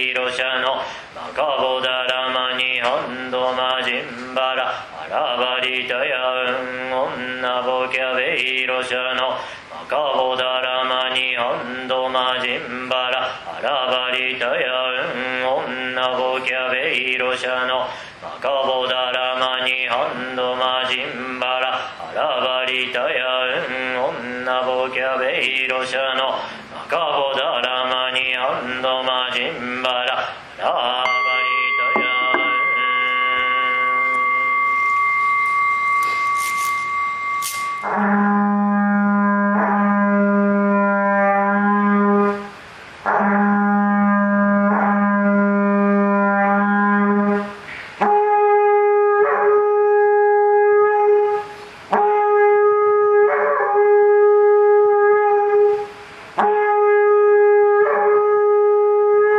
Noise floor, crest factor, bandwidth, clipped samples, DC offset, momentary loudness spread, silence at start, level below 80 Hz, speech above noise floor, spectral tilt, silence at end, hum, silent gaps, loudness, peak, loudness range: -38 dBFS; 16 dB; 15 kHz; under 0.1%; under 0.1%; 9 LU; 0 s; -62 dBFS; 17 dB; -5 dB/octave; 0 s; none; none; -18 LUFS; -2 dBFS; 5 LU